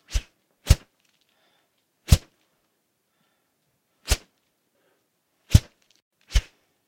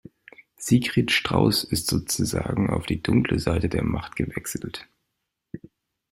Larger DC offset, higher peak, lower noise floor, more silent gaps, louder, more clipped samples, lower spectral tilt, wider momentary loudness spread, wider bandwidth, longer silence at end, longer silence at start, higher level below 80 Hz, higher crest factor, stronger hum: neither; first, 0 dBFS vs -4 dBFS; second, -73 dBFS vs -80 dBFS; first, 6.02-6.11 s vs none; about the same, -25 LUFS vs -24 LUFS; neither; about the same, -4.5 dB/octave vs -5 dB/octave; about the same, 16 LU vs 16 LU; about the same, 16.5 kHz vs 16 kHz; about the same, 0.45 s vs 0.55 s; second, 0.1 s vs 0.6 s; first, -30 dBFS vs -44 dBFS; first, 28 dB vs 20 dB; neither